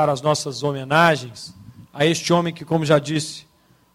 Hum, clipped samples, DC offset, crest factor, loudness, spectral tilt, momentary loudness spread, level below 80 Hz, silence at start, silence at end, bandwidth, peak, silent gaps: none; under 0.1%; under 0.1%; 18 dB; -20 LUFS; -5 dB/octave; 20 LU; -58 dBFS; 0 s; 0.55 s; 16 kHz; -2 dBFS; none